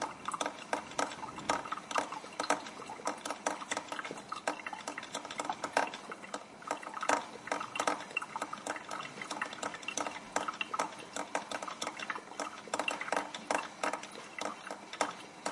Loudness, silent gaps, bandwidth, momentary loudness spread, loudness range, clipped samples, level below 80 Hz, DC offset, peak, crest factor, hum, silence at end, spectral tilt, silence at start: -38 LUFS; none; 11.5 kHz; 7 LU; 2 LU; under 0.1%; -78 dBFS; under 0.1%; -12 dBFS; 26 dB; none; 0 s; -1.5 dB/octave; 0 s